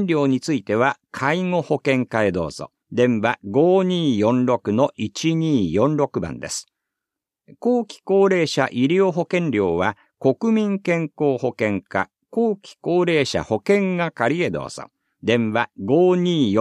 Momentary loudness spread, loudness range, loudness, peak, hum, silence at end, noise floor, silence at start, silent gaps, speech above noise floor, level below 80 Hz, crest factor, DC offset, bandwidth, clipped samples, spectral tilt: 8 LU; 2 LU; -20 LUFS; -2 dBFS; none; 0 s; -85 dBFS; 0 s; none; 66 dB; -56 dBFS; 18 dB; under 0.1%; 12 kHz; under 0.1%; -6 dB/octave